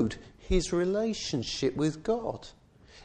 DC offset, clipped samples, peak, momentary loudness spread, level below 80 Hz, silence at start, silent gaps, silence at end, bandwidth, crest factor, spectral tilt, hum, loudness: under 0.1%; under 0.1%; -12 dBFS; 13 LU; -42 dBFS; 0 s; none; 0 s; 9.8 kHz; 18 dB; -5 dB/octave; none; -30 LUFS